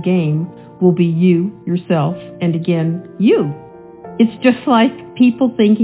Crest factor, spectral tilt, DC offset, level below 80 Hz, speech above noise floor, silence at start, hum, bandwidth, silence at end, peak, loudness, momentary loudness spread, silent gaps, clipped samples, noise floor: 14 dB; -12 dB/octave; under 0.1%; -58 dBFS; 21 dB; 0 s; none; 4 kHz; 0 s; 0 dBFS; -15 LUFS; 8 LU; none; under 0.1%; -35 dBFS